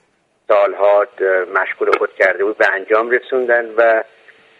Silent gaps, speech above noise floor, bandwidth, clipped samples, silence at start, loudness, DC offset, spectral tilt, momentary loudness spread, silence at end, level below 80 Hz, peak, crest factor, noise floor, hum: none; 24 dB; 7.8 kHz; under 0.1%; 0.5 s; -15 LUFS; under 0.1%; -4 dB/octave; 4 LU; 0.55 s; -68 dBFS; 0 dBFS; 16 dB; -39 dBFS; none